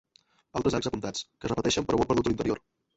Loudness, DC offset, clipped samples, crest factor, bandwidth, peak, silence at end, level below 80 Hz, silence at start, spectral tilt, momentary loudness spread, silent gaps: -29 LUFS; under 0.1%; under 0.1%; 18 dB; 8.2 kHz; -10 dBFS; 0.4 s; -50 dBFS; 0.55 s; -5 dB/octave; 9 LU; none